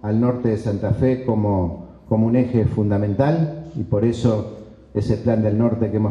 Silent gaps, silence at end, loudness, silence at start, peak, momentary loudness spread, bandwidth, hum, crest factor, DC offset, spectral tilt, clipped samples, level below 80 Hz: none; 0 s; -20 LUFS; 0.05 s; -4 dBFS; 8 LU; 7.8 kHz; none; 16 dB; under 0.1%; -9.5 dB/octave; under 0.1%; -42 dBFS